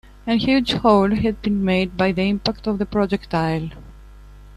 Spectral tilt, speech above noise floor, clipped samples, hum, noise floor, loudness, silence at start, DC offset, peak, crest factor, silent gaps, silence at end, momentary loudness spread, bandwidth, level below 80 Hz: -7 dB/octave; 23 dB; under 0.1%; 50 Hz at -40 dBFS; -42 dBFS; -20 LUFS; 0.25 s; under 0.1%; -2 dBFS; 18 dB; none; 0 s; 7 LU; 11 kHz; -40 dBFS